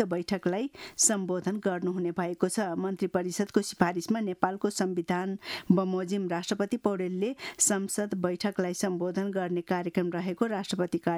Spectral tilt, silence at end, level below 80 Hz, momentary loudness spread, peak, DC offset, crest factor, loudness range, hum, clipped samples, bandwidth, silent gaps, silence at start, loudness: -4.5 dB/octave; 0 s; -68 dBFS; 6 LU; -8 dBFS; under 0.1%; 22 dB; 1 LU; none; under 0.1%; 16 kHz; none; 0 s; -29 LUFS